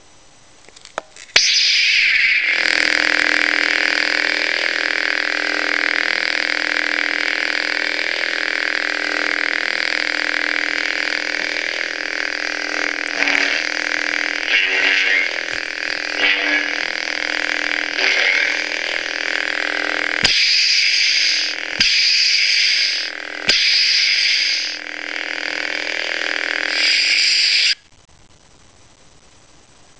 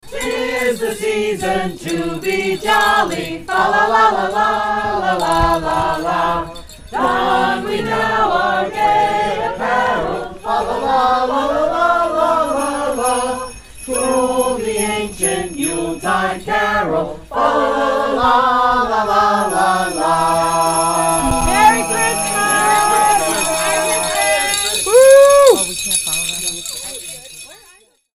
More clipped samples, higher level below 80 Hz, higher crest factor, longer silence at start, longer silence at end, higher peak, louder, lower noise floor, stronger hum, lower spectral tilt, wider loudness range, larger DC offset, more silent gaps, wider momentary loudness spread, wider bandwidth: neither; second, -56 dBFS vs -36 dBFS; about the same, 18 dB vs 16 dB; first, 0.95 s vs 0.05 s; first, 2.25 s vs 0.6 s; about the same, 0 dBFS vs 0 dBFS; about the same, -16 LUFS vs -15 LUFS; about the same, -49 dBFS vs -49 dBFS; neither; second, 0.5 dB/octave vs -2.5 dB/octave; about the same, 5 LU vs 6 LU; first, 0.3% vs under 0.1%; neither; about the same, 9 LU vs 8 LU; second, 8 kHz vs 16 kHz